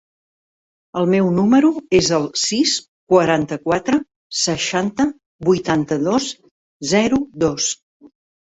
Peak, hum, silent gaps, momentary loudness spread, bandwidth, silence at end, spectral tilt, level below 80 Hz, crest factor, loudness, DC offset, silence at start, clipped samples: -2 dBFS; none; 2.88-3.07 s, 4.16-4.30 s, 5.26-5.39 s, 6.51-6.80 s, 7.82-8.00 s; 8 LU; 8.4 kHz; 0.4 s; -4 dB/octave; -50 dBFS; 16 dB; -18 LUFS; under 0.1%; 0.95 s; under 0.1%